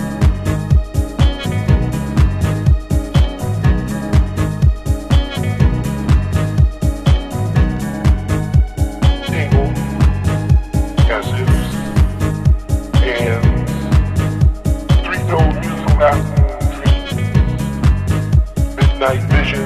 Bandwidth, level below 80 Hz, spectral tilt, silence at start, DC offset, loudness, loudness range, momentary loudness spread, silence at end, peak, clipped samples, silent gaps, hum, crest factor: 14 kHz; -18 dBFS; -7 dB/octave; 0 s; under 0.1%; -16 LUFS; 1 LU; 3 LU; 0 s; 0 dBFS; under 0.1%; none; none; 14 dB